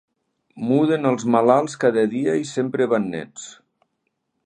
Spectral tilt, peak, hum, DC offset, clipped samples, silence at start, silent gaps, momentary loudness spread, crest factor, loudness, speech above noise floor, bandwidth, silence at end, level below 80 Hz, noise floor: -6 dB/octave; 0 dBFS; none; under 0.1%; under 0.1%; 0.55 s; none; 14 LU; 20 dB; -20 LUFS; 55 dB; 10 kHz; 0.9 s; -68 dBFS; -75 dBFS